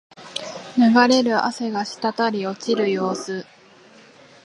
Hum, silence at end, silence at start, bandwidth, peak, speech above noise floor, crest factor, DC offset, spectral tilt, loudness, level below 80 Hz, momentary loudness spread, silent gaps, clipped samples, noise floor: none; 1.05 s; 0.2 s; 11.5 kHz; -2 dBFS; 29 dB; 20 dB; under 0.1%; -4.5 dB/octave; -20 LUFS; -74 dBFS; 16 LU; none; under 0.1%; -49 dBFS